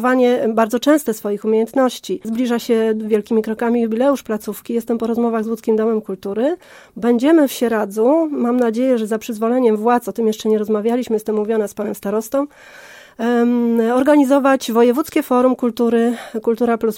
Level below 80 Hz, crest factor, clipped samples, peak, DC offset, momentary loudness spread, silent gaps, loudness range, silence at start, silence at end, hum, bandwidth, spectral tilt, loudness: -60 dBFS; 14 dB; under 0.1%; -2 dBFS; under 0.1%; 8 LU; none; 4 LU; 0 s; 0 s; none; 17 kHz; -5.5 dB/octave; -17 LUFS